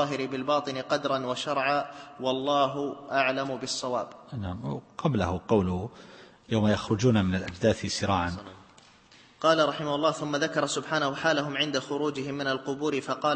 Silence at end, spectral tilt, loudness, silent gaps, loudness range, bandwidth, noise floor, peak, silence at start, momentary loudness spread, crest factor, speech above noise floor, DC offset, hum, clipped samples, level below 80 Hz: 0 s; -5 dB/octave; -28 LUFS; none; 2 LU; 8.8 kHz; -56 dBFS; -10 dBFS; 0 s; 9 LU; 18 dB; 28 dB; under 0.1%; none; under 0.1%; -56 dBFS